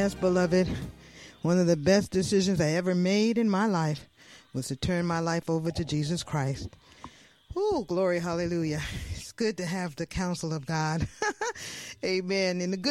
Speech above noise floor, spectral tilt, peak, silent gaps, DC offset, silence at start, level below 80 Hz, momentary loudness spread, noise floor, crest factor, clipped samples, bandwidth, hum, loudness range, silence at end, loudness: 23 dB; -5.5 dB/octave; -12 dBFS; none; under 0.1%; 0 s; -50 dBFS; 13 LU; -50 dBFS; 18 dB; under 0.1%; 13 kHz; none; 5 LU; 0 s; -28 LUFS